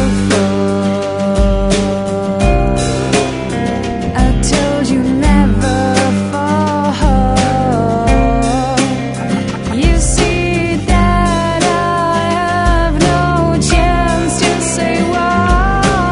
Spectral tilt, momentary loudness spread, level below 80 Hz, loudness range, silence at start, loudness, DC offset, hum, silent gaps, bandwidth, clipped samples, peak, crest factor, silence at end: -5.5 dB/octave; 4 LU; -18 dBFS; 2 LU; 0 s; -13 LUFS; under 0.1%; none; none; 11 kHz; under 0.1%; 0 dBFS; 12 dB; 0 s